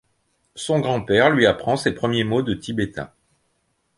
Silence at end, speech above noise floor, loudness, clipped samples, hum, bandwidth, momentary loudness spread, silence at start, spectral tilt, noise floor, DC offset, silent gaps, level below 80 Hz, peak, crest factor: 0.9 s; 49 dB; -20 LUFS; under 0.1%; none; 11.5 kHz; 13 LU; 0.55 s; -5.5 dB/octave; -69 dBFS; under 0.1%; none; -50 dBFS; -2 dBFS; 20 dB